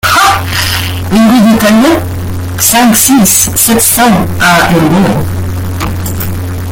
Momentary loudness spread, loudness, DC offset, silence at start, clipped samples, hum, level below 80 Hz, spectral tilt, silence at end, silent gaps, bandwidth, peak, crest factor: 11 LU; -7 LUFS; under 0.1%; 0.05 s; 0.5%; none; -28 dBFS; -4 dB/octave; 0 s; none; over 20 kHz; 0 dBFS; 8 dB